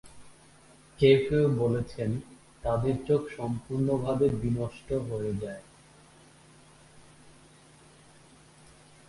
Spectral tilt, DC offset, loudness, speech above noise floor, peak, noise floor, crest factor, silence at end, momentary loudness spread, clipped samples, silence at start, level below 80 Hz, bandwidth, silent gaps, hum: -7.5 dB/octave; under 0.1%; -28 LUFS; 29 dB; -8 dBFS; -56 dBFS; 22 dB; 3.5 s; 13 LU; under 0.1%; 0.05 s; -52 dBFS; 11.5 kHz; none; none